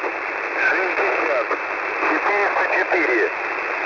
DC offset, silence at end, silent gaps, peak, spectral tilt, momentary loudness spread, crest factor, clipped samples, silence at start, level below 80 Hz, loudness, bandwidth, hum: under 0.1%; 0 s; none; -8 dBFS; -3.5 dB/octave; 6 LU; 12 dB; under 0.1%; 0 s; -62 dBFS; -19 LUFS; 6 kHz; none